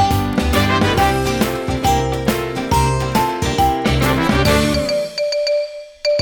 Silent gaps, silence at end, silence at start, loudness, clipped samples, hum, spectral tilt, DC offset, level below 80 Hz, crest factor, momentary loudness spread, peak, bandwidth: none; 0 s; 0 s; -17 LUFS; under 0.1%; none; -5 dB/octave; under 0.1%; -28 dBFS; 14 dB; 5 LU; -2 dBFS; over 20 kHz